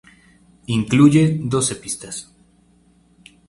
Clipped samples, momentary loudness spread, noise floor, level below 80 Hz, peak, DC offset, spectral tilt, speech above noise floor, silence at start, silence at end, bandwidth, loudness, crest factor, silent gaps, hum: under 0.1%; 16 LU; -55 dBFS; -52 dBFS; 0 dBFS; under 0.1%; -5.5 dB/octave; 38 dB; 0.7 s; 1.25 s; 11.5 kHz; -17 LUFS; 20 dB; none; none